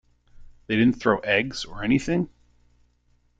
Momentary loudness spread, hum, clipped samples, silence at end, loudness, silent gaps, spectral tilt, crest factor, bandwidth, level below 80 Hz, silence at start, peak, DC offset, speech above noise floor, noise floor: 10 LU; 60 Hz at -45 dBFS; under 0.1%; 1.1 s; -24 LUFS; none; -6 dB/octave; 22 dB; 9 kHz; -50 dBFS; 0.4 s; -4 dBFS; under 0.1%; 42 dB; -64 dBFS